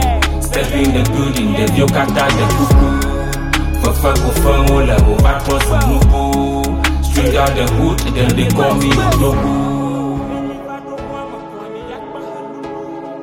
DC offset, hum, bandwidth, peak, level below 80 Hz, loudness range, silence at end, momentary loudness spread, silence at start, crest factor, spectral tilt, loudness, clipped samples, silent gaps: under 0.1%; none; 17.5 kHz; 0 dBFS; -18 dBFS; 7 LU; 0 s; 15 LU; 0 s; 12 dB; -5.5 dB/octave; -14 LUFS; under 0.1%; none